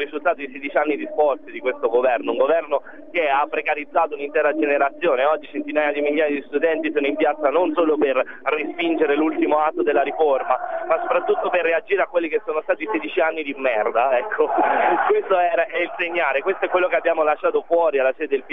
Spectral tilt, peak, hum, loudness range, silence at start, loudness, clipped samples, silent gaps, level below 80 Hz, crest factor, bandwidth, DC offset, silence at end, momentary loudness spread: -7 dB/octave; -4 dBFS; none; 2 LU; 0 s; -20 LUFS; under 0.1%; none; -70 dBFS; 16 dB; 3.9 kHz; 0.7%; 0 s; 5 LU